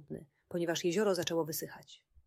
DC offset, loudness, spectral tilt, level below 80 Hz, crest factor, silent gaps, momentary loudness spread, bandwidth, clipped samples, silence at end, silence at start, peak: under 0.1%; -34 LUFS; -4 dB/octave; -72 dBFS; 16 dB; none; 17 LU; 16 kHz; under 0.1%; 0.3 s; 0 s; -20 dBFS